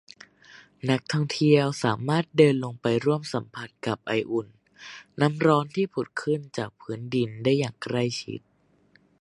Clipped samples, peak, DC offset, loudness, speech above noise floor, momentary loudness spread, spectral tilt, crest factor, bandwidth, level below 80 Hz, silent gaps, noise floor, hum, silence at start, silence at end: under 0.1%; -4 dBFS; under 0.1%; -25 LUFS; 37 dB; 16 LU; -6.5 dB/octave; 22 dB; 11.5 kHz; -66 dBFS; none; -62 dBFS; none; 0.55 s; 0.85 s